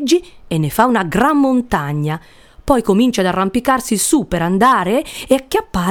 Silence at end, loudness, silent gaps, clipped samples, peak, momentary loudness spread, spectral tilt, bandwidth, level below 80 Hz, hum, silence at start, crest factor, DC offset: 0 s; -15 LUFS; none; under 0.1%; 0 dBFS; 7 LU; -5 dB/octave; 19 kHz; -38 dBFS; none; 0 s; 16 dB; under 0.1%